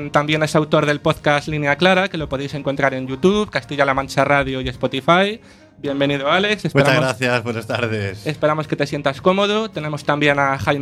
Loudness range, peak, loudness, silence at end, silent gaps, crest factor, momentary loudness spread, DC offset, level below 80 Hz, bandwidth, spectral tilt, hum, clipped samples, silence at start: 1 LU; 0 dBFS; -18 LUFS; 0 s; none; 18 dB; 8 LU; under 0.1%; -46 dBFS; 13.5 kHz; -5.5 dB/octave; none; under 0.1%; 0 s